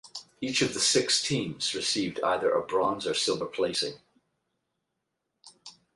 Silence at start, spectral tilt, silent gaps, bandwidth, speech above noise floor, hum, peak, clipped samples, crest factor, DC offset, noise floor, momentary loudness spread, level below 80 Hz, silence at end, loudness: 0.05 s; -2.5 dB/octave; none; 11.5 kHz; 54 dB; none; -12 dBFS; under 0.1%; 18 dB; under 0.1%; -82 dBFS; 7 LU; -66 dBFS; 0.25 s; -27 LUFS